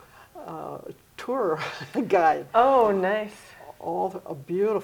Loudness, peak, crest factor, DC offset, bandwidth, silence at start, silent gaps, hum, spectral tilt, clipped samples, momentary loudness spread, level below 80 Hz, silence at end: -24 LUFS; -6 dBFS; 18 dB; under 0.1%; 20 kHz; 0.2 s; none; none; -6 dB/octave; under 0.1%; 20 LU; -62 dBFS; 0 s